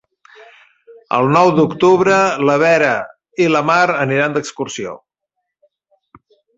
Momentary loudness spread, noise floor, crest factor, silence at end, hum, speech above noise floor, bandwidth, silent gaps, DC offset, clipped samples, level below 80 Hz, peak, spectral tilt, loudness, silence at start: 12 LU; -76 dBFS; 16 dB; 1.6 s; none; 62 dB; 8 kHz; none; under 0.1%; under 0.1%; -58 dBFS; 0 dBFS; -5.5 dB/octave; -14 LUFS; 0.9 s